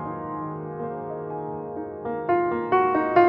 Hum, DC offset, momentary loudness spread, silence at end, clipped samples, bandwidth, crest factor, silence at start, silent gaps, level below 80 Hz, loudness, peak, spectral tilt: none; under 0.1%; 12 LU; 0 s; under 0.1%; 5.4 kHz; 20 dB; 0 s; none; -60 dBFS; -27 LUFS; -4 dBFS; -9.5 dB/octave